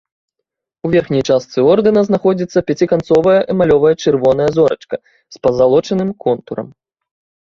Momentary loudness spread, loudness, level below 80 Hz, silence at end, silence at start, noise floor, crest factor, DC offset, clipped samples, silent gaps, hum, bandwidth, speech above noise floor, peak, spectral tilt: 12 LU; -14 LUFS; -46 dBFS; 0.85 s; 0.85 s; -78 dBFS; 14 dB; under 0.1%; under 0.1%; none; none; 7.4 kHz; 65 dB; 0 dBFS; -7 dB/octave